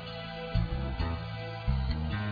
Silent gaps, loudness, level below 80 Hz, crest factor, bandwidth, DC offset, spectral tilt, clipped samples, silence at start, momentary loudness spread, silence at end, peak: none; -34 LUFS; -36 dBFS; 16 dB; 5 kHz; under 0.1%; -8.5 dB/octave; under 0.1%; 0 s; 6 LU; 0 s; -16 dBFS